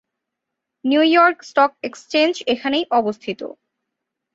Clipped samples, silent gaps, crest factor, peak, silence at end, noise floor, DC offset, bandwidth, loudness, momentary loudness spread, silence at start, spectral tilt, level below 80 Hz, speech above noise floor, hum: under 0.1%; none; 18 dB; -2 dBFS; 0.9 s; -81 dBFS; under 0.1%; 8 kHz; -18 LUFS; 15 LU; 0.85 s; -4 dB/octave; -66 dBFS; 63 dB; none